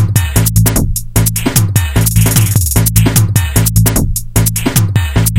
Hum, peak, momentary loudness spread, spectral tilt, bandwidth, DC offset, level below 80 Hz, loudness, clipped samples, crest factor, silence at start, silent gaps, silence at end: none; 0 dBFS; 3 LU; -4.5 dB/octave; 17.5 kHz; under 0.1%; -20 dBFS; -11 LUFS; 0.3%; 10 dB; 0 s; none; 0 s